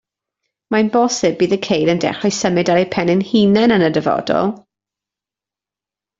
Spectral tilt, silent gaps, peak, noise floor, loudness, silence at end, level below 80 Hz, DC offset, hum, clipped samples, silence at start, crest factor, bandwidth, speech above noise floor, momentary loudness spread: -5 dB/octave; none; -2 dBFS; -88 dBFS; -16 LUFS; 1.6 s; -54 dBFS; under 0.1%; none; under 0.1%; 0.7 s; 16 dB; 7.8 kHz; 74 dB; 6 LU